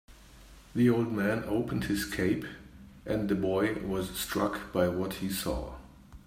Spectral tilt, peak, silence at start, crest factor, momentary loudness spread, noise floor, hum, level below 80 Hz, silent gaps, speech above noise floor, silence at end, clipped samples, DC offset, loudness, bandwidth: -5.5 dB/octave; -14 dBFS; 0.1 s; 18 dB; 11 LU; -53 dBFS; none; -50 dBFS; none; 23 dB; 0.1 s; under 0.1%; under 0.1%; -31 LUFS; 16 kHz